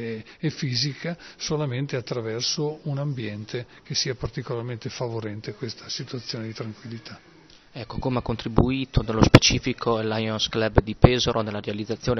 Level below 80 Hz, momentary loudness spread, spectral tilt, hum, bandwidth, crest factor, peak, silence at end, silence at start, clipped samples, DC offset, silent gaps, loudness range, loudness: -38 dBFS; 16 LU; -5 dB/octave; none; 7.6 kHz; 24 dB; 0 dBFS; 0 s; 0 s; under 0.1%; under 0.1%; none; 12 LU; -25 LUFS